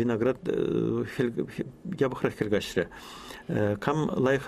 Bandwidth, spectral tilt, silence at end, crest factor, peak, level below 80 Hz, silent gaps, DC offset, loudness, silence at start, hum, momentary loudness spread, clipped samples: 14.5 kHz; -6.5 dB/octave; 0 s; 16 dB; -12 dBFS; -56 dBFS; none; under 0.1%; -29 LUFS; 0 s; none; 10 LU; under 0.1%